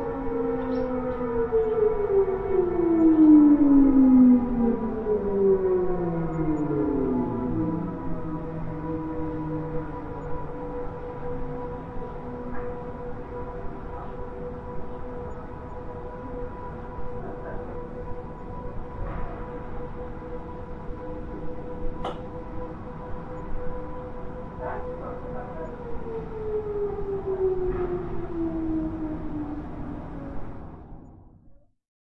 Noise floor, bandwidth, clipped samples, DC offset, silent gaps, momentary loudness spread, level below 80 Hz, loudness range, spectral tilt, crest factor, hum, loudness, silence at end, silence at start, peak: -53 dBFS; 4.1 kHz; under 0.1%; under 0.1%; none; 17 LU; -40 dBFS; 18 LU; -10.5 dB/octave; 18 dB; none; -26 LUFS; 0.45 s; 0 s; -8 dBFS